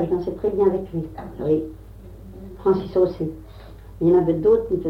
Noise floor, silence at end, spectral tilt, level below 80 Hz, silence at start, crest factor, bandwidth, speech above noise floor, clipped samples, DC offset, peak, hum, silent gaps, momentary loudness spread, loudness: -40 dBFS; 0 s; -10 dB/octave; -42 dBFS; 0 s; 16 dB; 5.8 kHz; 20 dB; under 0.1%; under 0.1%; -6 dBFS; none; none; 22 LU; -21 LUFS